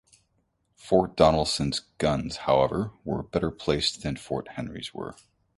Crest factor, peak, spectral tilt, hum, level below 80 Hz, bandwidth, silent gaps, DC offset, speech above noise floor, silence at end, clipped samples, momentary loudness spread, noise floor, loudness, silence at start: 24 dB; -4 dBFS; -5 dB/octave; none; -46 dBFS; 11.5 kHz; none; under 0.1%; 46 dB; 0.45 s; under 0.1%; 14 LU; -72 dBFS; -26 LUFS; 0.85 s